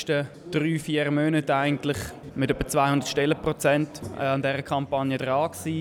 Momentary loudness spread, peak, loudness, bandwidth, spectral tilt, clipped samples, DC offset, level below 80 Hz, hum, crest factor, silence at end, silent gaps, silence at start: 7 LU; -10 dBFS; -25 LUFS; 17.5 kHz; -5.5 dB/octave; under 0.1%; under 0.1%; -50 dBFS; none; 16 dB; 0 s; none; 0 s